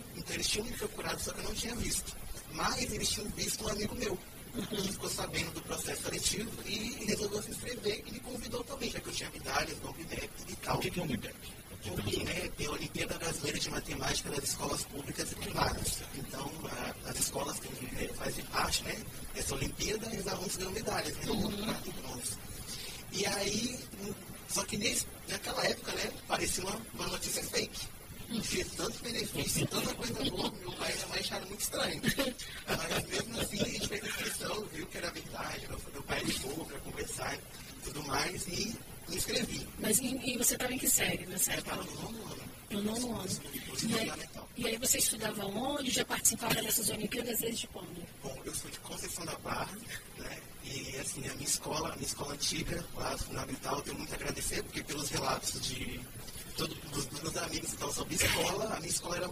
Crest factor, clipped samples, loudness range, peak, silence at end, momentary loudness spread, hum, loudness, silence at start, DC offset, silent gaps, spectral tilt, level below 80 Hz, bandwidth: 24 dB; under 0.1%; 6 LU; -12 dBFS; 0 s; 10 LU; none; -35 LUFS; 0 s; under 0.1%; none; -2.5 dB/octave; -50 dBFS; 15.5 kHz